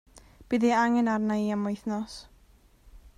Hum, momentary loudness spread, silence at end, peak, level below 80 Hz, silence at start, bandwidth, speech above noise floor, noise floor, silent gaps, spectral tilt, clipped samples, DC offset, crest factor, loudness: none; 12 LU; 0.1 s; -12 dBFS; -56 dBFS; 0.15 s; 11 kHz; 33 dB; -59 dBFS; none; -6 dB/octave; under 0.1%; under 0.1%; 18 dB; -27 LUFS